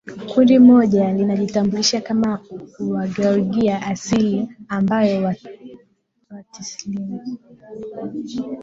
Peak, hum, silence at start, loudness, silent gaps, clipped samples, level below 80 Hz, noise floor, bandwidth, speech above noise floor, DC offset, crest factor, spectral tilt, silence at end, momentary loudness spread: -2 dBFS; none; 0.05 s; -18 LUFS; none; under 0.1%; -56 dBFS; -61 dBFS; 7.6 kHz; 42 dB; under 0.1%; 16 dB; -5.5 dB/octave; 0 s; 20 LU